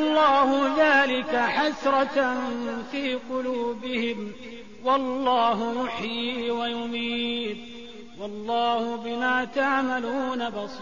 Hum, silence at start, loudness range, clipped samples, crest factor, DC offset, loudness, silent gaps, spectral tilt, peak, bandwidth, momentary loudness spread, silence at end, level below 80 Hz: none; 0 s; 5 LU; under 0.1%; 16 dB; 0.5%; -25 LUFS; none; -4 dB/octave; -8 dBFS; 7.4 kHz; 14 LU; 0 s; -60 dBFS